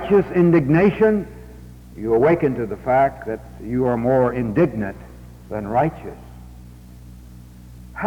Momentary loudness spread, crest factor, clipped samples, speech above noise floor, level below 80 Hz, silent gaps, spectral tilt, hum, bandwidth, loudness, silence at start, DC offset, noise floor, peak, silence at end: 21 LU; 16 dB; under 0.1%; 22 dB; -42 dBFS; none; -9.5 dB/octave; 60 Hz at -40 dBFS; 18 kHz; -19 LUFS; 0 s; under 0.1%; -41 dBFS; -6 dBFS; 0 s